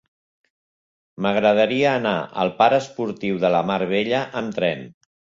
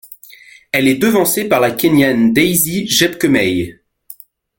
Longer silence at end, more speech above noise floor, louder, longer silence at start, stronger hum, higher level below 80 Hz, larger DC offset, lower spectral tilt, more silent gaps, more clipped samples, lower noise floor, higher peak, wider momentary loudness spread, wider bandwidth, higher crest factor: about the same, 0.45 s vs 0.45 s; first, over 70 dB vs 28 dB; second, -21 LUFS vs -13 LUFS; first, 1.2 s vs 0.1 s; neither; second, -62 dBFS vs -48 dBFS; neither; first, -6 dB/octave vs -4 dB/octave; neither; neither; first, under -90 dBFS vs -41 dBFS; about the same, -2 dBFS vs 0 dBFS; first, 9 LU vs 5 LU; second, 7.8 kHz vs 17 kHz; about the same, 18 dB vs 14 dB